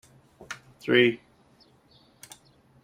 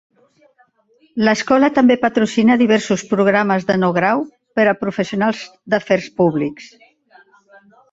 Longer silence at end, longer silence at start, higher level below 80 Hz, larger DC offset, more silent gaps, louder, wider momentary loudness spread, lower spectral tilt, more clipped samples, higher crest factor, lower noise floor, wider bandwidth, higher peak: first, 1.7 s vs 1.25 s; second, 0.5 s vs 1.15 s; second, -70 dBFS vs -58 dBFS; neither; neither; second, -23 LUFS vs -16 LUFS; first, 27 LU vs 8 LU; about the same, -5 dB/octave vs -6 dB/octave; neither; first, 24 dB vs 16 dB; about the same, -60 dBFS vs -57 dBFS; first, 15.5 kHz vs 8 kHz; second, -6 dBFS vs -2 dBFS